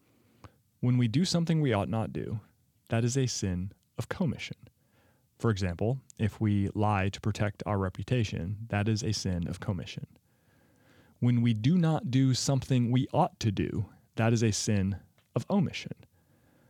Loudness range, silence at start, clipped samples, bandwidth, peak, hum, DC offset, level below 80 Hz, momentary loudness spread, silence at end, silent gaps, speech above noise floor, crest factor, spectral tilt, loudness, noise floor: 6 LU; 0.45 s; under 0.1%; 13 kHz; -12 dBFS; none; under 0.1%; -60 dBFS; 12 LU; 0.75 s; none; 38 dB; 18 dB; -6 dB/octave; -30 LUFS; -67 dBFS